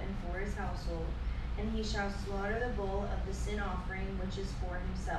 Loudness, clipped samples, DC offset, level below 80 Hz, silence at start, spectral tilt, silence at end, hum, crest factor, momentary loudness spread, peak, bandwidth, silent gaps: -38 LUFS; under 0.1%; under 0.1%; -38 dBFS; 0 s; -6 dB/octave; 0 s; none; 14 dB; 4 LU; -22 dBFS; 11.5 kHz; none